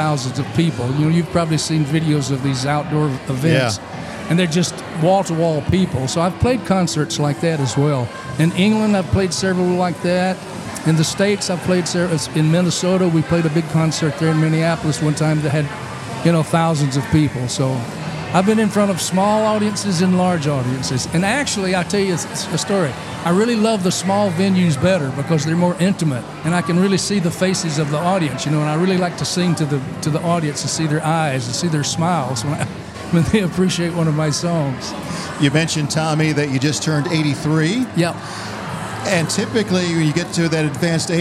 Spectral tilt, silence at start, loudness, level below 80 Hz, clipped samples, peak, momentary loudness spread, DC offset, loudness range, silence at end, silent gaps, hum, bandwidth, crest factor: -5.5 dB/octave; 0 s; -18 LUFS; -48 dBFS; under 0.1%; -2 dBFS; 5 LU; under 0.1%; 2 LU; 0 s; none; none; 13.5 kHz; 16 dB